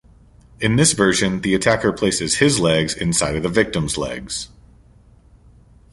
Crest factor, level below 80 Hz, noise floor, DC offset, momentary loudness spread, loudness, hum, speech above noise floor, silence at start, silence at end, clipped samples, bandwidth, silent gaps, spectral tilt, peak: 18 dB; -42 dBFS; -50 dBFS; under 0.1%; 10 LU; -18 LUFS; none; 31 dB; 0.6 s; 1.45 s; under 0.1%; 11.5 kHz; none; -4 dB/octave; -2 dBFS